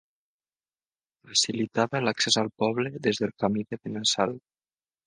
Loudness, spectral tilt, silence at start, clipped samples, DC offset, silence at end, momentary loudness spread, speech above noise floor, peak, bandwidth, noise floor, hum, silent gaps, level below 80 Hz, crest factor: -26 LUFS; -3 dB/octave; 1.25 s; under 0.1%; under 0.1%; 0.7 s; 6 LU; over 63 dB; -8 dBFS; 10 kHz; under -90 dBFS; none; none; -68 dBFS; 22 dB